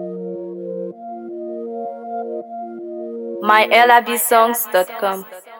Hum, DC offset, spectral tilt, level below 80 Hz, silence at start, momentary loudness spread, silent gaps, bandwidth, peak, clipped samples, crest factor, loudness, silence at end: none; under 0.1%; -2.5 dB/octave; -76 dBFS; 0 s; 18 LU; none; 19 kHz; 0 dBFS; under 0.1%; 18 dB; -16 LUFS; 0 s